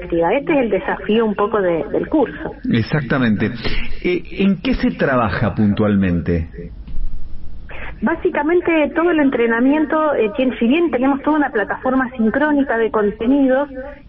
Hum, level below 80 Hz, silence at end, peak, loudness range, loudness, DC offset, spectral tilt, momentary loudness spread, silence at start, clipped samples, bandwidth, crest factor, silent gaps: none; -32 dBFS; 0.1 s; -6 dBFS; 4 LU; -17 LUFS; under 0.1%; -10.5 dB/octave; 9 LU; 0 s; under 0.1%; 5.8 kHz; 10 dB; none